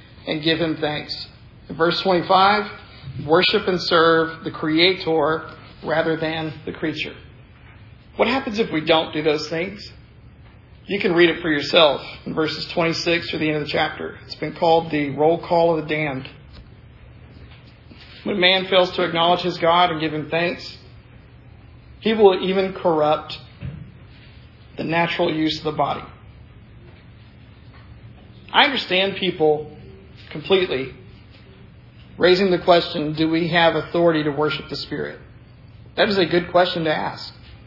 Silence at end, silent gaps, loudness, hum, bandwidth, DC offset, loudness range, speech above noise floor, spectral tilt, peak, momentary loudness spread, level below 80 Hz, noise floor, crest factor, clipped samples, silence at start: 0 s; none; -20 LUFS; none; 6 kHz; under 0.1%; 6 LU; 26 dB; -6 dB/octave; 0 dBFS; 16 LU; -50 dBFS; -45 dBFS; 20 dB; under 0.1%; 0.15 s